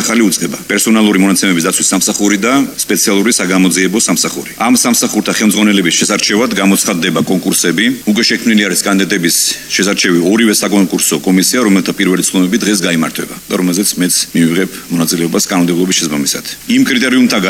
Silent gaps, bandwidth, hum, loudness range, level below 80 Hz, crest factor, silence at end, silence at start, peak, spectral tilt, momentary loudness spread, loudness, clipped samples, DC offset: none; 17 kHz; none; 2 LU; -50 dBFS; 10 dB; 0 s; 0 s; 0 dBFS; -3 dB/octave; 4 LU; -11 LUFS; under 0.1%; under 0.1%